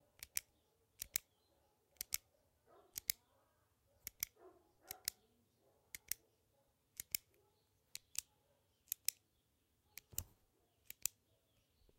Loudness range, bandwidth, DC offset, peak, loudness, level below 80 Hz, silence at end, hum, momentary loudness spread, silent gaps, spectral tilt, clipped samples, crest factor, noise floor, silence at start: 3 LU; 16.5 kHz; under 0.1%; -12 dBFS; -46 LUFS; -76 dBFS; 0.9 s; none; 13 LU; none; 1 dB/octave; under 0.1%; 40 dB; -81 dBFS; 0.2 s